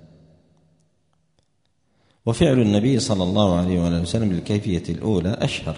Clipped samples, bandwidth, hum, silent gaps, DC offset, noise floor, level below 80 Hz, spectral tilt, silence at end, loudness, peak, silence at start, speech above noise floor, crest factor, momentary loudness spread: under 0.1%; 10.5 kHz; none; none; under 0.1%; -69 dBFS; -44 dBFS; -6.5 dB/octave; 0 s; -21 LUFS; -4 dBFS; 2.25 s; 50 dB; 18 dB; 7 LU